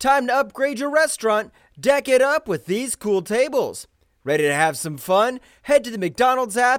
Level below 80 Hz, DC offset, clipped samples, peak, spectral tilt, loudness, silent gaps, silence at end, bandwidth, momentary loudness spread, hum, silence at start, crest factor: -58 dBFS; under 0.1%; under 0.1%; -6 dBFS; -3.5 dB/octave; -20 LUFS; none; 0 s; 18 kHz; 9 LU; none; 0 s; 14 dB